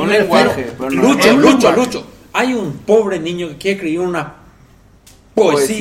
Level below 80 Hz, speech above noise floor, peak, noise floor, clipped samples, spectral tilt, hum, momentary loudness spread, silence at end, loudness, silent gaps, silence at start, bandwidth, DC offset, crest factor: -48 dBFS; 32 dB; 0 dBFS; -46 dBFS; under 0.1%; -4.5 dB/octave; none; 12 LU; 0 s; -14 LUFS; none; 0 s; 16.5 kHz; under 0.1%; 14 dB